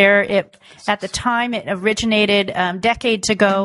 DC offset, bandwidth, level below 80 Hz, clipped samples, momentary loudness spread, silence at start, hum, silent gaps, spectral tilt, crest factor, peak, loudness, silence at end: under 0.1%; 11.5 kHz; -46 dBFS; under 0.1%; 7 LU; 0 s; none; none; -3.5 dB/octave; 18 dB; 0 dBFS; -18 LUFS; 0 s